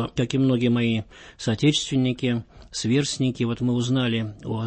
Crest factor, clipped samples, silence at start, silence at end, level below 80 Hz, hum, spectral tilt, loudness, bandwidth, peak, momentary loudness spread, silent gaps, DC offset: 14 dB; under 0.1%; 0 s; 0 s; -52 dBFS; none; -5.5 dB/octave; -24 LUFS; 8.8 kHz; -8 dBFS; 9 LU; none; under 0.1%